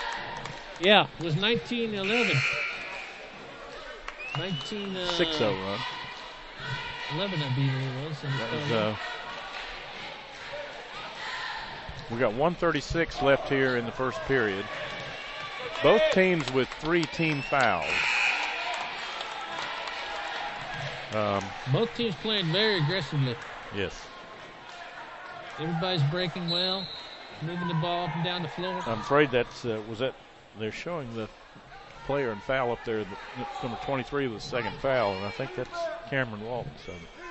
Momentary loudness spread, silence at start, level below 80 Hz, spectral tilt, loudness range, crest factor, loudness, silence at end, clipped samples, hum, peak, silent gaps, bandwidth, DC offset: 16 LU; 0 s; -52 dBFS; -5.5 dB/octave; 7 LU; 22 dB; -29 LUFS; 0 s; under 0.1%; none; -8 dBFS; none; 8.4 kHz; under 0.1%